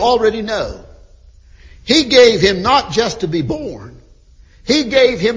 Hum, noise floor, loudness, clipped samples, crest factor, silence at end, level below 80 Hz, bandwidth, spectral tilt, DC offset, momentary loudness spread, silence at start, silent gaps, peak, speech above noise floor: none; -45 dBFS; -13 LUFS; under 0.1%; 16 dB; 0 s; -38 dBFS; 7.6 kHz; -4 dB/octave; under 0.1%; 18 LU; 0 s; none; 0 dBFS; 31 dB